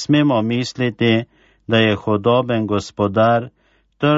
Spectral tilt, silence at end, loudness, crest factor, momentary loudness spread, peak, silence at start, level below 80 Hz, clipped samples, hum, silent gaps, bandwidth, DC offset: -6.5 dB/octave; 0 s; -18 LUFS; 16 dB; 6 LU; -2 dBFS; 0 s; -50 dBFS; under 0.1%; none; none; 8 kHz; under 0.1%